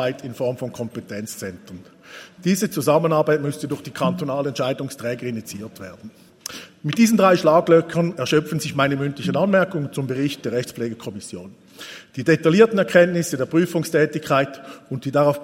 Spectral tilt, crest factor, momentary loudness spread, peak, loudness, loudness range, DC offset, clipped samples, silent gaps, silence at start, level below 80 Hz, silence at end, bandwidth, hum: -5.5 dB/octave; 20 dB; 19 LU; 0 dBFS; -20 LUFS; 6 LU; under 0.1%; under 0.1%; none; 0 s; -64 dBFS; 0 s; 16.5 kHz; none